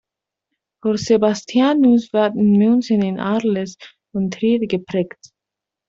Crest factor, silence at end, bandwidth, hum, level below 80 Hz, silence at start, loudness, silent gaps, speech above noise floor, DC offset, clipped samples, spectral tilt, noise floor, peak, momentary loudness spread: 14 dB; 0.8 s; 7.6 kHz; none; -60 dBFS; 0.85 s; -18 LUFS; none; 68 dB; under 0.1%; under 0.1%; -6.5 dB/octave; -85 dBFS; -4 dBFS; 10 LU